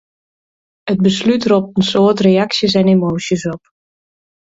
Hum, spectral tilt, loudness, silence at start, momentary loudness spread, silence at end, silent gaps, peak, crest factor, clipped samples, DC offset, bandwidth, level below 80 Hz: none; -6 dB/octave; -14 LUFS; 0.85 s; 9 LU; 0.85 s; none; 0 dBFS; 14 dB; under 0.1%; under 0.1%; 7.8 kHz; -50 dBFS